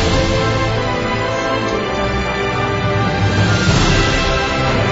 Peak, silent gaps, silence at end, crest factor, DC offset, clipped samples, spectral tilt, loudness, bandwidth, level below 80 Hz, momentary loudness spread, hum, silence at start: -2 dBFS; none; 0 s; 14 dB; under 0.1%; under 0.1%; -5 dB/octave; -16 LUFS; 7.8 kHz; -26 dBFS; 5 LU; none; 0 s